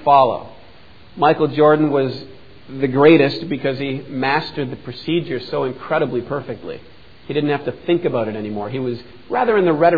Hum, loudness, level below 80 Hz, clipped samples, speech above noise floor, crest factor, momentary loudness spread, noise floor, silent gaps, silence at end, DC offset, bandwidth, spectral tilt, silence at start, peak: none; -18 LUFS; -54 dBFS; under 0.1%; 28 dB; 18 dB; 14 LU; -46 dBFS; none; 0 s; 0.7%; 5 kHz; -9 dB/octave; 0 s; 0 dBFS